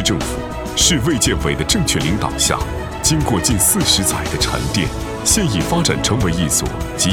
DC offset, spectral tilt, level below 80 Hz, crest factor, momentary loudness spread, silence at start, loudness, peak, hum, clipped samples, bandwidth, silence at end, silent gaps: under 0.1%; -3.5 dB/octave; -28 dBFS; 16 dB; 8 LU; 0 s; -16 LUFS; 0 dBFS; none; under 0.1%; 19.5 kHz; 0 s; none